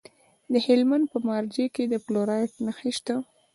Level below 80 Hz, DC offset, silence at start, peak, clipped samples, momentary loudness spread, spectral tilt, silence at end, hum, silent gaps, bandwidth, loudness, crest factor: -72 dBFS; under 0.1%; 0.5 s; -8 dBFS; under 0.1%; 9 LU; -5.5 dB/octave; 0.3 s; none; none; 11.5 kHz; -26 LUFS; 18 dB